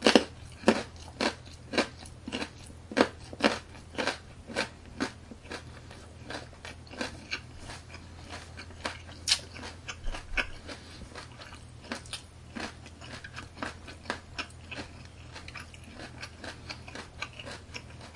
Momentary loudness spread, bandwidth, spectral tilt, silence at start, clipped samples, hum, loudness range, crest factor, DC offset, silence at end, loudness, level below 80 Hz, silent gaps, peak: 17 LU; 11.5 kHz; -3.5 dB/octave; 0 s; under 0.1%; none; 10 LU; 34 dB; under 0.1%; 0 s; -35 LUFS; -50 dBFS; none; 0 dBFS